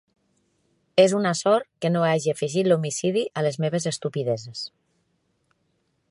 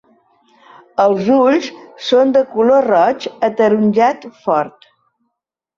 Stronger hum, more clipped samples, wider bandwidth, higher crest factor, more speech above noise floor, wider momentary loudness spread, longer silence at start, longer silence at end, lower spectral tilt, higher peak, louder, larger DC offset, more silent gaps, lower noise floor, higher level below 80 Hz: neither; neither; first, 11.5 kHz vs 7.4 kHz; first, 20 dB vs 14 dB; second, 48 dB vs 63 dB; second, 9 LU vs 12 LU; about the same, 0.95 s vs 1 s; first, 1.45 s vs 1.1 s; about the same, -5 dB/octave vs -6 dB/octave; about the same, -4 dBFS vs -2 dBFS; second, -23 LUFS vs -14 LUFS; neither; neither; second, -71 dBFS vs -77 dBFS; second, -72 dBFS vs -60 dBFS